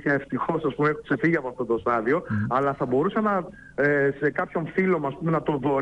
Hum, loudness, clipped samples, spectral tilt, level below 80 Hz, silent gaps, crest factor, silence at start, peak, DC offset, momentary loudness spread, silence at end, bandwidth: none; -25 LUFS; under 0.1%; -9 dB/octave; -56 dBFS; none; 14 dB; 0 s; -10 dBFS; under 0.1%; 4 LU; 0 s; 8.8 kHz